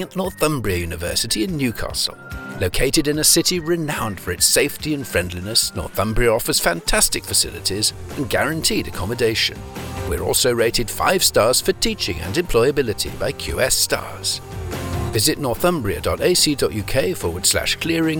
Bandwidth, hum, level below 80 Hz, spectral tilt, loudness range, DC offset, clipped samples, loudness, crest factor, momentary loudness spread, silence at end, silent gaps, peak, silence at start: 19.5 kHz; none; -34 dBFS; -3 dB/octave; 2 LU; under 0.1%; under 0.1%; -19 LUFS; 18 dB; 9 LU; 0 s; none; -2 dBFS; 0 s